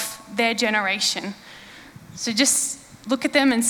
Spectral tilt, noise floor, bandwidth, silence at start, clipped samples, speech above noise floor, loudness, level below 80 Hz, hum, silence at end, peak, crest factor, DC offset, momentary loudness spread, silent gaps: -1.5 dB/octave; -44 dBFS; over 20 kHz; 0 s; under 0.1%; 22 dB; -21 LUFS; -62 dBFS; none; 0 s; -2 dBFS; 20 dB; under 0.1%; 22 LU; none